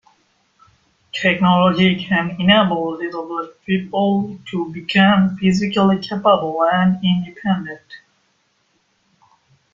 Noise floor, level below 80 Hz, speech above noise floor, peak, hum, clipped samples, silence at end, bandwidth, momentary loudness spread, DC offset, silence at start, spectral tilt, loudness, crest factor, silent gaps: -64 dBFS; -54 dBFS; 47 dB; 0 dBFS; none; under 0.1%; 1.75 s; 7.4 kHz; 12 LU; under 0.1%; 1.15 s; -6.5 dB/octave; -17 LUFS; 18 dB; none